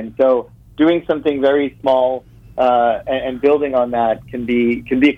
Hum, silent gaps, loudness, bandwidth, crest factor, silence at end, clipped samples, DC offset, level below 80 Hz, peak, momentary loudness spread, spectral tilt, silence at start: none; none; -17 LUFS; 6.6 kHz; 12 dB; 0 s; under 0.1%; under 0.1%; -46 dBFS; -4 dBFS; 6 LU; -7.5 dB/octave; 0 s